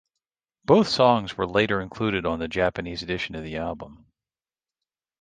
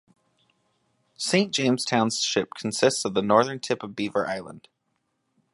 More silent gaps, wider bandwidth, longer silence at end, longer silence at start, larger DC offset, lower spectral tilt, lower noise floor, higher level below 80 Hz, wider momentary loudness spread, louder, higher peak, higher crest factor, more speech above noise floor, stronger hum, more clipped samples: neither; second, 9.6 kHz vs 11.5 kHz; first, 1.3 s vs 0.95 s; second, 0.7 s vs 1.2 s; neither; first, -6 dB/octave vs -3.5 dB/octave; first, under -90 dBFS vs -75 dBFS; first, -50 dBFS vs -68 dBFS; first, 13 LU vs 9 LU; about the same, -24 LUFS vs -24 LUFS; about the same, -4 dBFS vs -4 dBFS; about the same, 22 dB vs 24 dB; first, over 66 dB vs 51 dB; neither; neither